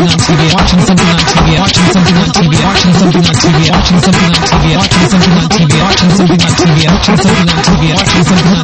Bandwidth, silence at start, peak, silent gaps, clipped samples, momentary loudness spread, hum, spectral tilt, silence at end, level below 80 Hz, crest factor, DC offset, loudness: 9 kHz; 0 s; 0 dBFS; none; under 0.1%; 1 LU; none; -5 dB/octave; 0 s; -22 dBFS; 6 dB; under 0.1%; -7 LUFS